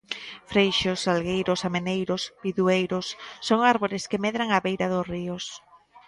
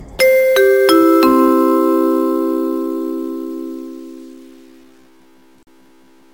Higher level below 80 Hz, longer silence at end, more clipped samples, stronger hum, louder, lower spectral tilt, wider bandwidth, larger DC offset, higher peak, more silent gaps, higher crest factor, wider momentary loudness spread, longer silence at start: second, -58 dBFS vs -52 dBFS; second, 0.1 s vs 2 s; neither; neither; second, -25 LUFS vs -13 LUFS; first, -5 dB/octave vs -3.5 dB/octave; second, 11.5 kHz vs 17 kHz; second, under 0.1% vs 0.3%; second, -6 dBFS vs 0 dBFS; neither; first, 20 dB vs 14 dB; second, 12 LU vs 18 LU; about the same, 0.1 s vs 0 s